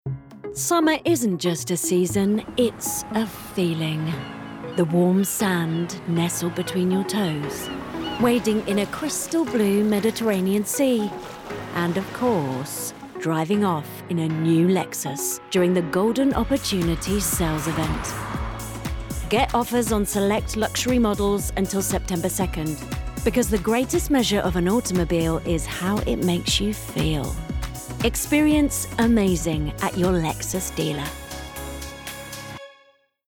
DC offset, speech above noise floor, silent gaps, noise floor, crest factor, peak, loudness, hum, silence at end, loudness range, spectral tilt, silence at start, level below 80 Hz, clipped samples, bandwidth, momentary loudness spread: under 0.1%; 36 dB; none; -59 dBFS; 14 dB; -8 dBFS; -23 LUFS; none; 0.55 s; 2 LU; -5 dB/octave; 0.05 s; -38 dBFS; under 0.1%; 19 kHz; 11 LU